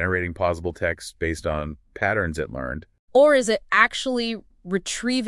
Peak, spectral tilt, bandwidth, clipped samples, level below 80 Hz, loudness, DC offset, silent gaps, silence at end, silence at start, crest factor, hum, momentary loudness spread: -2 dBFS; -4.5 dB/octave; 12 kHz; under 0.1%; -46 dBFS; -23 LUFS; under 0.1%; 2.99-3.08 s; 0 s; 0 s; 20 dB; none; 13 LU